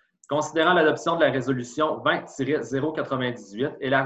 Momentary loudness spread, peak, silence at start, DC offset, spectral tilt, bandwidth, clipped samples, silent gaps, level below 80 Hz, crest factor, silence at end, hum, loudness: 9 LU; -8 dBFS; 0.3 s; under 0.1%; -5 dB/octave; 8.6 kHz; under 0.1%; none; -62 dBFS; 18 dB; 0 s; none; -24 LUFS